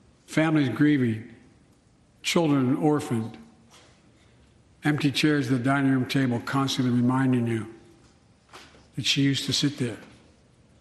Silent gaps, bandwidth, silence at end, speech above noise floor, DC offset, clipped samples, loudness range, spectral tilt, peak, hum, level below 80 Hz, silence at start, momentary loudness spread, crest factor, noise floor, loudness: none; 12.5 kHz; 0.75 s; 36 dB; under 0.1%; under 0.1%; 4 LU; -5.5 dB/octave; -6 dBFS; none; -62 dBFS; 0.3 s; 10 LU; 20 dB; -59 dBFS; -25 LUFS